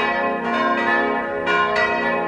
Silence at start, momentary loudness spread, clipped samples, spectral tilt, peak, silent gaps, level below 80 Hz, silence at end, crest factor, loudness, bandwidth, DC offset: 0 s; 3 LU; under 0.1%; -5 dB/octave; -6 dBFS; none; -52 dBFS; 0 s; 14 dB; -19 LUFS; 10.5 kHz; under 0.1%